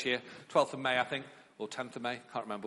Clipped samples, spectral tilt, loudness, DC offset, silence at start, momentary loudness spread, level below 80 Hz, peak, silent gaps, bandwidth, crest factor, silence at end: under 0.1%; -4 dB/octave; -35 LUFS; under 0.1%; 0 s; 11 LU; -78 dBFS; -12 dBFS; none; 11.5 kHz; 22 dB; 0 s